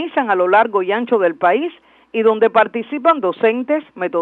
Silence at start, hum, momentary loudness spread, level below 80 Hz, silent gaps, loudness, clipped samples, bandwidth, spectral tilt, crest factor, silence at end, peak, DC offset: 0 s; none; 7 LU; -70 dBFS; none; -16 LUFS; under 0.1%; 4.3 kHz; -7 dB/octave; 14 dB; 0 s; -2 dBFS; under 0.1%